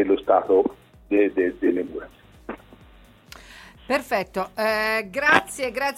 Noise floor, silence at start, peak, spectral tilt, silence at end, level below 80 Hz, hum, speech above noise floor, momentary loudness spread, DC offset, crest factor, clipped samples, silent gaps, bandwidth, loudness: -50 dBFS; 0 s; -2 dBFS; -4 dB/octave; 0 s; -54 dBFS; none; 29 dB; 21 LU; under 0.1%; 22 dB; under 0.1%; none; 16 kHz; -22 LUFS